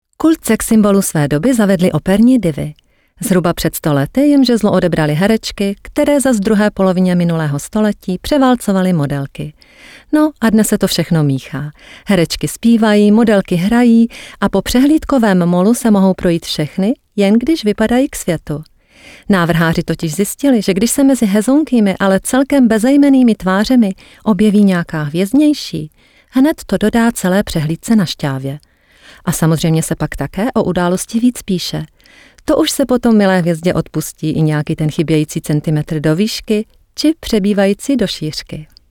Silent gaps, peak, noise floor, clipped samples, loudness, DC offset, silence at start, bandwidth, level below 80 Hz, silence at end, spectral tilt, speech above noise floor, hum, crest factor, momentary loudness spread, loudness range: none; -2 dBFS; -44 dBFS; under 0.1%; -13 LUFS; under 0.1%; 0.2 s; 18.5 kHz; -38 dBFS; 0.25 s; -6 dB/octave; 31 dB; none; 10 dB; 9 LU; 4 LU